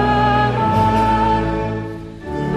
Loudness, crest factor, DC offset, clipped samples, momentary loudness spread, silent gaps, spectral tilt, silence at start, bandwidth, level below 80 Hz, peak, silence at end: -17 LUFS; 14 dB; under 0.1%; under 0.1%; 13 LU; none; -7.5 dB/octave; 0 s; 13 kHz; -30 dBFS; -4 dBFS; 0 s